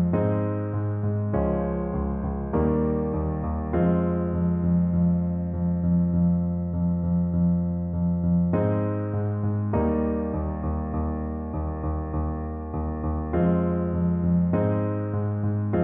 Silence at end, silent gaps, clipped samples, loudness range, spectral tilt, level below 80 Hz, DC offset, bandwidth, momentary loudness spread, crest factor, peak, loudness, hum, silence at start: 0 s; none; under 0.1%; 4 LU; -14 dB/octave; -36 dBFS; under 0.1%; 2.9 kHz; 6 LU; 14 dB; -10 dBFS; -25 LUFS; none; 0 s